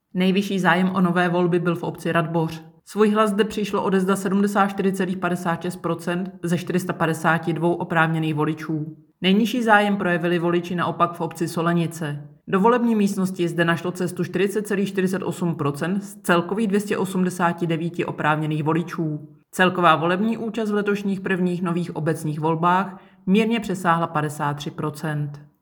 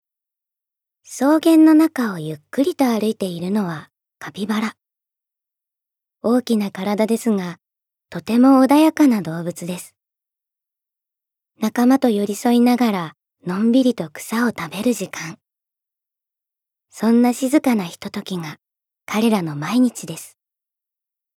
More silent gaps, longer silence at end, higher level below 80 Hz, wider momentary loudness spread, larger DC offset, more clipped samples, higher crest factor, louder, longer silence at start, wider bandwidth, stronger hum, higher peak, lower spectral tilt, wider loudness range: neither; second, 0.15 s vs 1.1 s; first, -64 dBFS vs -70 dBFS; second, 8 LU vs 18 LU; neither; neither; about the same, 20 dB vs 18 dB; second, -22 LUFS vs -18 LUFS; second, 0.15 s vs 1.1 s; first, 19.5 kHz vs 16 kHz; neither; about the same, -2 dBFS vs -2 dBFS; about the same, -6 dB/octave vs -5.5 dB/octave; second, 2 LU vs 6 LU